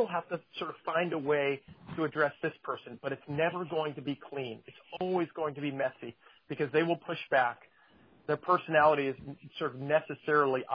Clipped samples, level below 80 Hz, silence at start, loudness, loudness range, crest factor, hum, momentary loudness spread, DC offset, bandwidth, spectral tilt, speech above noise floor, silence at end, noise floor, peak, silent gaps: under 0.1%; -72 dBFS; 0 s; -32 LUFS; 5 LU; 20 dB; none; 14 LU; under 0.1%; 5.2 kHz; -8.5 dB/octave; 30 dB; 0 s; -62 dBFS; -12 dBFS; none